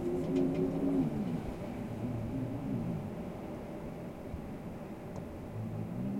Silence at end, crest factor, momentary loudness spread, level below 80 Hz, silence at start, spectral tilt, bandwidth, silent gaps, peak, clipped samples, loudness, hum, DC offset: 0 s; 16 dB; 12 LU; -52 dBFS; 0 s; -8.5 dB/octave; 16.5 kHz; none; -20 dBFS; under 0.1%; -37 LUFS; none; under 0.1%